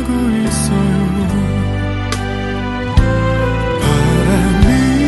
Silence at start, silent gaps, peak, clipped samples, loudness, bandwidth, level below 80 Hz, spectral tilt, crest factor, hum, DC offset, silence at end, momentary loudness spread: 0 s; none; 0 dBFS; under 0.1%; -15 LUFS; 12 kHz; -22 dBFS; -6 dB/octave; 14 dB; none; under 0.1%; 0 s; 7 LU